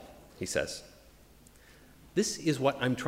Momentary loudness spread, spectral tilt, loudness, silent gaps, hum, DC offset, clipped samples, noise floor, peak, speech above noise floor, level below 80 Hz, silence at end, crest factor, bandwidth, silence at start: 13 LU; -4.5 dB/octave; -32 LUFS; none; none; under 0.1%; under 0.1%; -57 dBFS; -12 dBFS; 27 dB; -60 dBFS; 0 s; 22 dB; 16 kHz; 0 s